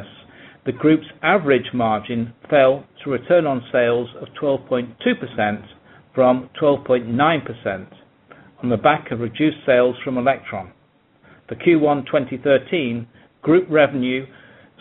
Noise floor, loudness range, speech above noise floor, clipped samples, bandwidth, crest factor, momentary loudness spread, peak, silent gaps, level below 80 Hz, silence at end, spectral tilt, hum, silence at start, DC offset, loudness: -56 dBFS; 2 LU; 37 dB; under 0.1%; 4.1 kHz; 20 dB; 11 LU; 0 dBFS; none; -58 dBFS; 0.55 s; -4.5 dB/octave; none; 0 s; under 0.1%; -19 LUFS